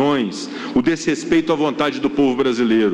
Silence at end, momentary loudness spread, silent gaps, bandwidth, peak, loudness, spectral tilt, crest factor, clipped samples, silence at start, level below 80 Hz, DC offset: 0 s; 5 LU; none; 10 kHz; -4 dBFS; -18 LUFS; -5 dB/octave; 14 dB; under 0.1%; 0 s; -52 dBFS; under 0.1%